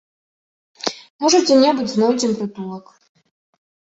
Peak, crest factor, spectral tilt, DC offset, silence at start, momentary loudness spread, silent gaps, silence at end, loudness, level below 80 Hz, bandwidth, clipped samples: -2 dBFS; 18 dB; -3.5 dB/octave; under 0.1%; 0.85 s; 17 LU; 1.10-1.19 s; 1.15 s; -17 LUFS; -64 dBFS; 8.2 kHz; under 0.1%